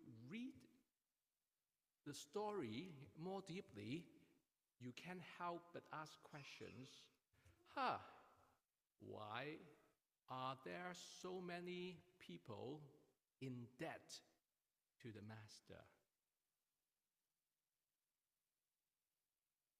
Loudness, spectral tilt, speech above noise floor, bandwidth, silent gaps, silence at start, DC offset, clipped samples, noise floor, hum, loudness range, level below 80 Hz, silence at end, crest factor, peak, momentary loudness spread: -54 LUFS; -5 dB/octave; over 37 dB; 15.5 kHz; none; 0 s; under 0.1%; under 0.1%; under -90 dBFS; none; 7 LU; under -90 dBFS; 3.9 s; 26 dB; -30 dBFS; 14 LU